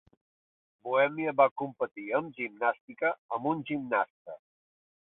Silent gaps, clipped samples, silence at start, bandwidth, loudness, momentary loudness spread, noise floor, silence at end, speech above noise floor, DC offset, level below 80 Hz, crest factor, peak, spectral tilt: 1.51-1.56 s, 2.81-2.88 s, 3.18-3.29 s, 4.10-4.25 s; under 0.1%; 0.85 s; 4 kHz; -30 LUFS; 13 LU; under -90 dBFS; 0.75 s; over 60 dB; under 0.1%; -78 dBFS; 22 dB; -10 dBFS; -9.5 dB/octave